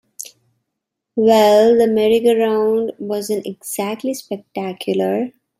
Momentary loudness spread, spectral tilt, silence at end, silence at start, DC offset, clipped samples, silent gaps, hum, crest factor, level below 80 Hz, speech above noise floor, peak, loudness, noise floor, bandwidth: 16 LU; -5 dB/octave; 0.3 s; 0.2 s; under 0.1%; under 0.1%; none; none; 16 dB; -62 dBFS; 63 dB; -2 dBFS; -17 LUFS; -79 dBFS; 16 kHz